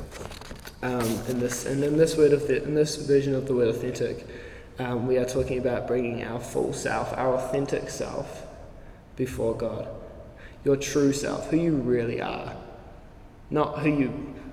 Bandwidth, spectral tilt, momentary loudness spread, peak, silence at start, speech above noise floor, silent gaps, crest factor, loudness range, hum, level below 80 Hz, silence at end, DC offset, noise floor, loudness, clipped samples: 16 kHz; -5.5 dB/octave; 19 LU; -8 dBFS; 0 s; 21 dB; none; 18 dB; 6 LU; none; -48 dBFS; 0 s; under 0.1%; -47 dBFS; -26 LUFS; under 0.1%